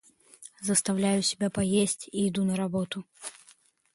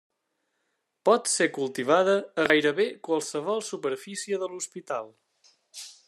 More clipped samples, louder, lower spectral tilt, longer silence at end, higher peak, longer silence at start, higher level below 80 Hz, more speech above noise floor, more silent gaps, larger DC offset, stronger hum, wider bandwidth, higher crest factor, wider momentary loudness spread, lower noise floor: neither; about the same, -28 LUFS vs -26 LUFS; first, -4.5 dB/octave vs -3 dB/octave; first, 0.65 s vs 0.15 s; second, -10 dBFS vs -6 dBFS; second, 0.4 s vs 1.05 s; first, -62 dBFS vs -76 dBFS; second, 33 dB vs 52 dB; neither; neither; neither; second, 11.5 kHz vs 13.5 kHz; about the same, 20 dB vs 22 dB; first, 17 LU vs 13 LU; second, -61 dBFS vs -78 dBFS